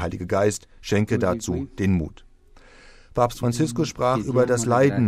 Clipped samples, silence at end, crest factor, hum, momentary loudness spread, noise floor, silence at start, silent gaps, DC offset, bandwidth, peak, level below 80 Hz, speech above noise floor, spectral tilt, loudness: under 0.1%; 0 s; 16 dB; none; 7 LU; -50 dBFS; 0 s; none; under 0.1%; 15.5 kHz; -6 dBFS; -44 dBFS; 28 dB; -6 dB/octave; -23 LUFS